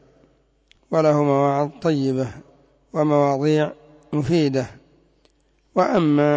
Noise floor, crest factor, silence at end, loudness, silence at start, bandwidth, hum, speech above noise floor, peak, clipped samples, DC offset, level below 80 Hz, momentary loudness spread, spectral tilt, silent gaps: -61 dBFS; 14 dB; 0 s; -21 LUFS; 0.9 s; 8 kHz; none; 42 dB; -6 dBFS; under 0.1%; under 0.1%; -56 dBFS; 9 LU; -7.5 dB/octave; none